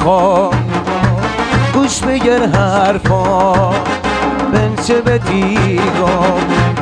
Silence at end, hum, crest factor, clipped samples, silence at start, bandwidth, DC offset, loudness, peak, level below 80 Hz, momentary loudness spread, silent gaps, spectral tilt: 0 s; none; 12 dB; under 0.1%; 0 s; 10 kHz; under 0.1%; -13 LUFS; 0 dBFS; -30 dBFS; 4 LU; none; -6 dB/octave